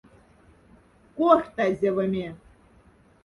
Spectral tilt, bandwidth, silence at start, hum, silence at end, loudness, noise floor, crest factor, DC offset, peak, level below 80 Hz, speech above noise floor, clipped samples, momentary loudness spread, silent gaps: -7.5 dB/octave; 11.5 kHz; 1.15 s; none; 0.9 s; -24 LUFS; -57 dBFS; 22 dB; under 0.1%; -6 dBFS; -58 dBFS; 34 dB; under 0.1%; 15 LU; none